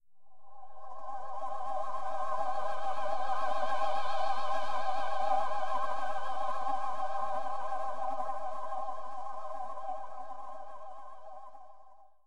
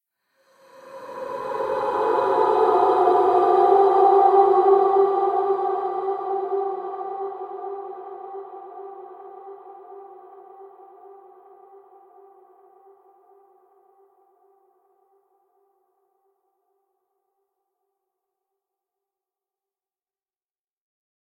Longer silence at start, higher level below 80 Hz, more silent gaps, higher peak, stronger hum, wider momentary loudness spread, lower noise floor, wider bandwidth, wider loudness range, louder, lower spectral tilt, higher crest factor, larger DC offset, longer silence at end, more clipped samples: second, 0 s vs 0.85 s; about the same, -70 dBFS vs -70 dBFS; neither; second, -16 dBFS vs -4 dBFS; neither; second, 16 LU vs 25 LU; second, -57 dBFS vs under -90 dBFS; first, 12.5 kHz vs 5 kHz; second, 8 LU vs 23 LU; second, -36 LUFS vs -20 LUFS; second, -4 dB/octave vs -6.5 dB/octave; second, 14 dB vs 20 dB; first, 3% vs under 0.1%; second, 0 s vs 10.15 s; neither